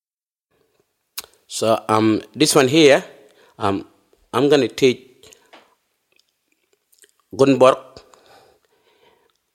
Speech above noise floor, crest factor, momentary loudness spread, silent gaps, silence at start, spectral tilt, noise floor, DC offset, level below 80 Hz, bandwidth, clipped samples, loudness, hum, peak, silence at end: over 74 dB; 20 dB; 20 LU; none; 1.15 s; -4.5 dB/octave; under -90 dBFS; under 0.1%; -64 dBFS; 16.5 kHz; under 0.1%; -17 LUFS; none; 0 dBFS; 1.75 s